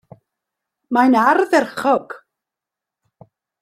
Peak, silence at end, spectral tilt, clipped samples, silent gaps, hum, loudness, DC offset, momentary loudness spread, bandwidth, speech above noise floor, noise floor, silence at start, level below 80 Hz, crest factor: -2 dBFS; 1.45 s; -5 dB/octave; under 0.1%; none; none; -16 LUFS; under 0.1%; 16 LU; 14 kHz; 70 dB; -86 dBFS; 0.9 s; -66 dBFS; 18 dB